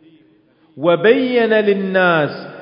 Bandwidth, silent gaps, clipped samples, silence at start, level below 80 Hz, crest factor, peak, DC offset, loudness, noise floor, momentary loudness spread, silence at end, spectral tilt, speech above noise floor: 5.4 kHz; none; under 0.1%; 0.75 s; -72 dBFS; 16 dB; 0 dBFS; under 0.1%; -15 LUFS; -53 dBFS; 6 LU; 0 s; -11 dB/octave; 39 dB